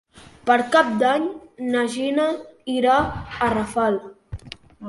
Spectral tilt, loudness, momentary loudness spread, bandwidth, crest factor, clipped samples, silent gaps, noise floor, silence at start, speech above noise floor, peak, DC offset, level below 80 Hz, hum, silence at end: -5 dB/octave; -21 LUFS; 18 LU; 11.5 kHz; 18 dB; under 0.1%; none; -41 dBFS; 0.15 s; 20 dB; -4 dBFS; under 0.1%; -46 dBFS; none; 0 s